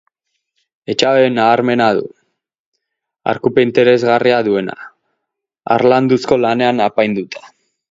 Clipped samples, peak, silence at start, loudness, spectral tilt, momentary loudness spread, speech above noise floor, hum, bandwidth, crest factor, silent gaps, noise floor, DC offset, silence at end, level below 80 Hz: under 0.1%; 0 dBFS; 0.9 s; -14 LUFS; -6 dB/octave; 16 LU; 64 dB; none; 8 kHz; 16 dB; 2.59-2.72 s; -77 dBFS; under 0.1%; 0.45 s; -58 dBFS